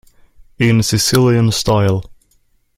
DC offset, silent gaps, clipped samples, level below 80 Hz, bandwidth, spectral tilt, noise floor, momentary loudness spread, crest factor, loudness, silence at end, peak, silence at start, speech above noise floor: under 0.1%; none; under 0.1%; -40 dBFS; 16 kHz; -5 dB/octave; -57 dBFS; 6 LU; 16 dB; -14 LUFS; 0.65 s; 0 dBFS; 0.6 s; 44 dB